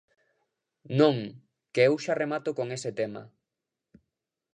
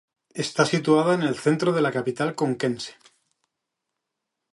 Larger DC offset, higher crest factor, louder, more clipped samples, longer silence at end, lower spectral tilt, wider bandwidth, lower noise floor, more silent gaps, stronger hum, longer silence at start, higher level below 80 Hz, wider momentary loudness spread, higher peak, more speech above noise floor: neither; about the same, 22 dB vs 18 dB; second, -27 LUFS vs -23 LUFS; neither; second, 1.3 s vs 1.6 s; about the same, -6 dB/octave vs -5.5 dB/octave; second, 10 kHz vs 11.5 kHz; first, -87 dBFS vs -83 dBFS; neither; neither; first, 0.9 s vs 0.35 s; second, -76 dBFS vs -70 dBFS; about the same, 11 LU vs 12 LU; about the same, -8 dBFS vs -6 dBFS; about the same, 61 dB vs 60 dB